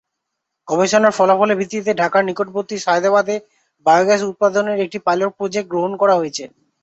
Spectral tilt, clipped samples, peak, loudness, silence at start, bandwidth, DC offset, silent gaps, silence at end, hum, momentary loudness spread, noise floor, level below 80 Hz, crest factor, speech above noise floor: -4.5 dB/octave; under 0.1%; -2 dBFS; -17 LUFS; 0.65 s; 8.2 kHz; under 0.1%; none; 0.35 s; none; 9 LU; -78 dBFS; -64 dBFS; 16 dB; 61 dB